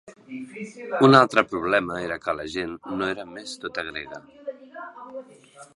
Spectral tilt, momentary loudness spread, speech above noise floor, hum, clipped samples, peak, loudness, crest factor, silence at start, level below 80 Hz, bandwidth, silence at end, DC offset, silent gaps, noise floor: -5.5 dB/octave; 24 LU; 25 dB; none; under 0.1%; 0 dBFS; -23 LUFS; 24 dB; 0.05 s; -60 dBFS; 11.5 kHz; 0.1 s; under 0.1%; none; -49 dBFS